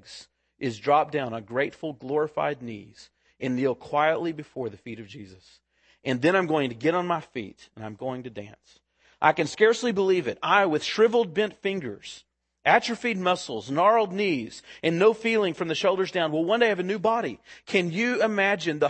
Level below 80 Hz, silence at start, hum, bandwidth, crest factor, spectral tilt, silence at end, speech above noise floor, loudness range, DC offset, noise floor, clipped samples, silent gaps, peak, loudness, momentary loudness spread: -70 dBFS; 0.05 s; none; 8.8 kHz; 22 dB; -5 dB/octave; 0 s; 24 dB; 5 LU; under 0.1%; -49 dBFS; under 0.1%; none; -2 dBFS; -25 LUFS; 18 LU